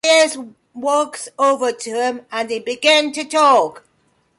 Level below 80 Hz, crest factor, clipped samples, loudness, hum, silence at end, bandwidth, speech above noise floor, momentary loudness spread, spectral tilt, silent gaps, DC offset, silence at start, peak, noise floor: -70 dBFS; 14 dB; under 0.1%; -17 LUFS; none; 0.6 s; 11.5 kHz; 44 dB; 12 LU; -1 dB/octave; none; under 0.1%; 0.05 s; -4 dBFS; -62 dBFS